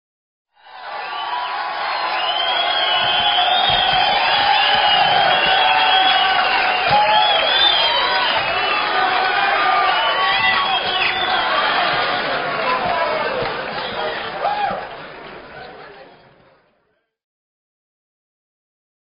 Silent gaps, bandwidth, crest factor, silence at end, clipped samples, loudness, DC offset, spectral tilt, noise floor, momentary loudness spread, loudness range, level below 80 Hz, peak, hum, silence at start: none; 5.4 kHz; 16 dB; 3.05 s; under 0.1%; -16 LUFS; under 0.1%; 2 dB/octave; -66 dBFS; 11 LU; 11 LU; -50 dBFS; -2 dBFS; none; 0.65 s